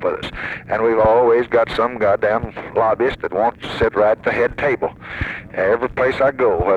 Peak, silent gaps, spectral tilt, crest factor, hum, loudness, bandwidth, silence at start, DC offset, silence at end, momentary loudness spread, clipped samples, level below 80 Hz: -2 dBFS; none; -7 dB/octave; 14 dB; none; -18 LUFS; 8.8 kHz; 0 s; under 0.1%; 0 s; 11 LU; under 0.1%; -40 dBFS